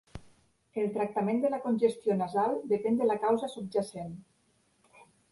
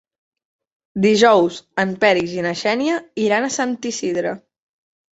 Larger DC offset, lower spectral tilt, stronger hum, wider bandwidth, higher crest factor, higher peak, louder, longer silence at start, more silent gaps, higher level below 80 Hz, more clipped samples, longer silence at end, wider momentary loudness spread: neither; first, -7 dB/octave vs -4 dB/octave; neither; first, 11.5 kHz vs 8.2 kHz; about the same, 18 dB vs 18 dB; second, -14 dBFS vs -2 dBFS; second, -30 LUFS vs -18 LUFS; second, 0.15 s vs 0.95 s; neither; about the same, -64 dBFS vs -60 dBFS; neither; second, 0.3 s vs 0.75 s; first, 15 LU vs 10 LU